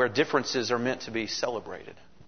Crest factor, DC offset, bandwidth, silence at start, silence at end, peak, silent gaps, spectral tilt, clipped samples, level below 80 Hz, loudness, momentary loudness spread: 20 dB; 0.3%; 6.6 kHz; 0 s; 0.35 s; -8 dBFS; none; -3.5 dB/octave; under 0.1%; -64 dBFS; -29 LUFS; 16 LU